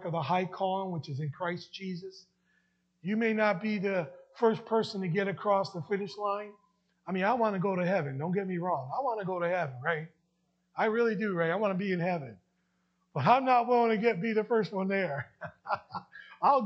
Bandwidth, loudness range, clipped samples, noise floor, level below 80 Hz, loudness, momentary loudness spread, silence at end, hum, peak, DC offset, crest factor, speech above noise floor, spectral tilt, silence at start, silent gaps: 8.2 kHz; 5 LU; under 0.1%; -76 dBFS; -80 dBFS; -31 LUFS; 14 LU; 0 s; none; -10 dBFS; under 0.1%; 22 dB; 46 dB; -7.5 dB/octave; 0 s; none